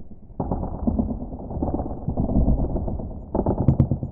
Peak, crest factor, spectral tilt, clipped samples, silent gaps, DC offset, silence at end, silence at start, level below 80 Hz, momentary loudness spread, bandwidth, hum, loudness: -4 dBFS; 20 dB; -14 dB/octave; under 0.1%; none; under 0.1%; 0 s; 0 s; -30 dBFS; 11 LU; 2.3 kHz; none; -25 LUFS